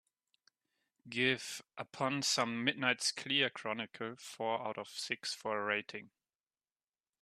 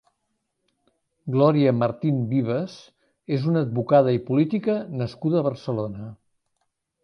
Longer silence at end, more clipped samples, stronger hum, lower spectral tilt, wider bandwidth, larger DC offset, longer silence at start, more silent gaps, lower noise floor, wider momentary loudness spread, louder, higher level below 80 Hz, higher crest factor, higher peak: first, 1.15 s vs 0.9 s; neither; neither; second, -2.5 dB/octave vs -9.5 dB/octave; first, 14 kHz vs 6.6 kHz; neither; second, 1.05 s vs 1.25 s; neither; first, under -90 dBFS vs -76 dBFS; about the same, 12 LU vs 12 LU; second, -36 LUFS vs -23 LUFS; second, -84 dBFS vs -62 dBFS; first, 24 dB vs 18 dB; second, -16 dBFS vs -6 dBFS